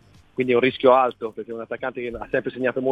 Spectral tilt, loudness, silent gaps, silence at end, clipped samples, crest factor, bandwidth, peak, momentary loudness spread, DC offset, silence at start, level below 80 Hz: -7.5 dB/octave; -22 LUFS; none; 0 s; under 0.1%; 20 dB; 5 kHz; -2 dBFS; 15 LU; under 0.1%; 0.4 s; -56 dBFS